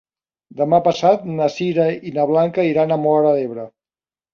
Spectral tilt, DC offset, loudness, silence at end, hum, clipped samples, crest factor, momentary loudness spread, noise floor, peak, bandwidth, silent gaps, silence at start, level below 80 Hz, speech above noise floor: -7 dB/octave; under 0.1%; -17 LUFS; 0.65 s; none; under 0.1%; 16 dB; 7 LU; under -90 dBFS; -2 dBFS; 7.2 kHz; none; 0.55 s; -62 dBFS; over 73 dB